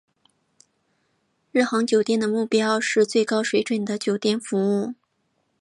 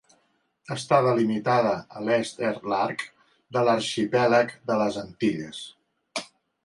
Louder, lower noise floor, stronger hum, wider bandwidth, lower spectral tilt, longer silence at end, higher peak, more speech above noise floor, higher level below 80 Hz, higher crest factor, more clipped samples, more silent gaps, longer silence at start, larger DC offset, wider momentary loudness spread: first, -22 LUFS vs -25 LUFS; about the same, -71 dBFS vs -69 dBFS; neither; about the same, 11.5 kHz vs 11.5 kHz; about the same, -4.5 dB/octave vs -5.5 dB/octave; first, 0.65 s vs 0.4 s; about the same, -8 dBFS vs -6 dBFS; first, 50 dB vs 45 dB; second, -74 dBFS vs -66 dBFS; about the same, 16 dB vs 20 dB; neither; neither; first, 1.55 s vs 0.7 s; neither; second, 5 LU vs 14 LU